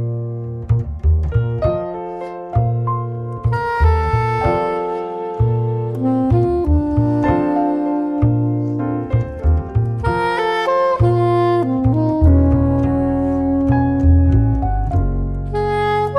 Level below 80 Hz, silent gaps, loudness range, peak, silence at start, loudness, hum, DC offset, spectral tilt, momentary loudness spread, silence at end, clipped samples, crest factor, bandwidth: -24 dBFS; none; 4 LU; -2 dBFS; 0 s; -17 LUFS; none; under 0.1%; -9.5 dB/octave; 8 LU; 0 s; under 0.1%; 14 dB; 6 kHz